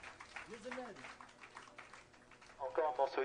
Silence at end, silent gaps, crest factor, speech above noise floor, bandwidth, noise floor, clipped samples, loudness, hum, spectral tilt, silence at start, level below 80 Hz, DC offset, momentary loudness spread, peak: 0 s; none; 22 dB; 22 dB; 10 kHz; -62 dBFS; under 0.1%; -43 LUFS; none; -3.5 dB/octave; 0 s; -74 dBFS; under 0.1%; 22 LU; -22 dBFS